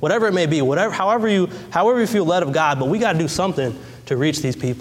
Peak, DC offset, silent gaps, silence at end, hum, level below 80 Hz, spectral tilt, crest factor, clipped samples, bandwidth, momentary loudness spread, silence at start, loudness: -4 dBFS; under 0.1%; none; 0 s; none; -52 dBFS; -5.5 dB/octave; 14 dB; under 0.1%; 16 kHz; 6 LU; 0 s; -19 LUFS